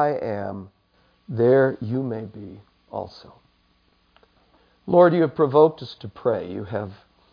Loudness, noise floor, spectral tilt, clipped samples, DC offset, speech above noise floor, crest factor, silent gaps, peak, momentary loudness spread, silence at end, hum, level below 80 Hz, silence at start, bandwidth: -21 LUFS; -63 dBFS; -9.5 dB/octave; under 0.1%; under 0.1%; 42 dB; 20 dB; none; -2 dBFS; 21 LU; 0.4 s; none; -62 dBFS; 0 s; 5.2 kHz